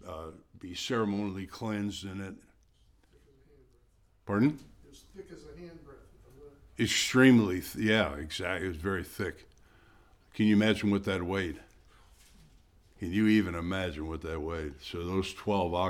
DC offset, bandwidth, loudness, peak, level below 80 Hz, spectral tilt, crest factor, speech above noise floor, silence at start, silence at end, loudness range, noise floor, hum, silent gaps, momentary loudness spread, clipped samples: under 0.1%; 17.5 kHz; -30 LUFS; -8 dBFS; -54 dBFS; -5 dB/octave; 24 dB; 35 dB; 0.05 s; 0 s; 9 LU; -65 dBFS; none; none; 22 LU; under 0.1%